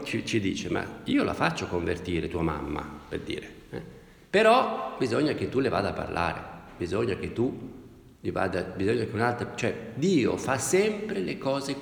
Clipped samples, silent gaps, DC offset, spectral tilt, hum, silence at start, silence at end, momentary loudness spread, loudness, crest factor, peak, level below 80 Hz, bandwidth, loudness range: under 0.1%; none; under 0.1%; -5 dB/octave; none; 0 s; 0 s; 13 LU; -28 LUFS; 20 dB; -8 dBFS; -52 dBFS; over 20 kHz; 4 LU